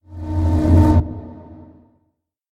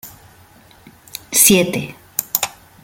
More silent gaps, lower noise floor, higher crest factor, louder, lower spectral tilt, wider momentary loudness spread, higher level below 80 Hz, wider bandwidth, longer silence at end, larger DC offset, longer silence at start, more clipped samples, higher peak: neither; first, -70 dBFS vs -47 dBFS; about the same, 16 dB vs 20 dB; about the same, -16 LUFS vs -15 LUFS; first, -9.5 dB/octave vs -2.5 dB/octave; about the same, 20 LU vs 19 LU; first, -26 dBFS vs -54 dBFS; second, 5.4 kHz vs 17 kHz; first, 0.95 s vs 0.35 s; neither; about the same, 0.1 s vs 0.05 s; neither; about the same, -2 dBFS vs 0 dBFS